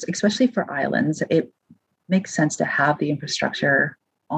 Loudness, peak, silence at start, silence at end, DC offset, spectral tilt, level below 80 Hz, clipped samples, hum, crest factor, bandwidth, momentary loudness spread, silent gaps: -22 LUFS; -4 dBFS; 0 s; 0 s; under 0.1%; -5 dB/octave; -66 dBFS; under 0.1%; none; 18 dB; 9.4 kHz; 5 LU; none